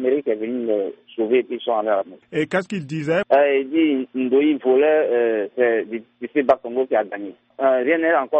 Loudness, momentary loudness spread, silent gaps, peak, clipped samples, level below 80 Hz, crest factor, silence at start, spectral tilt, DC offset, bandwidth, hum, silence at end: -20 LUFS; 10 LU; none; -4 dBFS; under 0.1%; -68 dBFS; 16 dB; 0 s; -7 dB/octave; under 0.1%; 8.4 kHz; none; 0 s